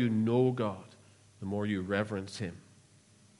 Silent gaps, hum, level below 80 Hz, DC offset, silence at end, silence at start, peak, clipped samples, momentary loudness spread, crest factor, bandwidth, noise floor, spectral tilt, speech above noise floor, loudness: none; none; -72 dBFS; under 0.1%; 0.8 s; 0 s; -16 dBFS; under 0.1%; 14 LU; 18 dB; 11.5 kHz; -62 dBFS; -7 dB/octave; 30 dB; -32 LUFS